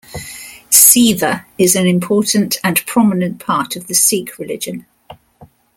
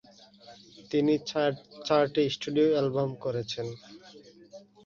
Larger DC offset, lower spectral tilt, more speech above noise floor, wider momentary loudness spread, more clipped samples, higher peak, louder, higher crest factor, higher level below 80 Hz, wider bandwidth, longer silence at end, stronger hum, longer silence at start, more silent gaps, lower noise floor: neither; second, -3 dB/octave vs -6 dB/octave; first, 31 dB vs 26 dB; first, 19 LU vs 13 LU; first, 0.2% vs under 0.1%; first, 0 dBFS vs -10 dBFS; first, -12 LUFS vs -28 LUFS; about the same, 16 dB vs 20 dB; first, -52 dBFS vs -68 dBFS; first, over 20 kHz vs 7.4 kHz; about the same, 0.3 s vs 0.25 s; neither; second, 0.1 s vs 0.5 s; neither; second, -45 dBFS vs -53 dBFS